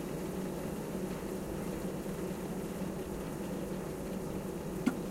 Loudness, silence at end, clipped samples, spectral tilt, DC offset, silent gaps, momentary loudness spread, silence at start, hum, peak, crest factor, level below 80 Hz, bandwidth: -39 LUFS; 0 s; under 0.1%; -6 dB/octave; under 0.1%; none; 3 LU; 0 s; none; -18 dBFS; 20 dB; -52 dBFS; 16 kHz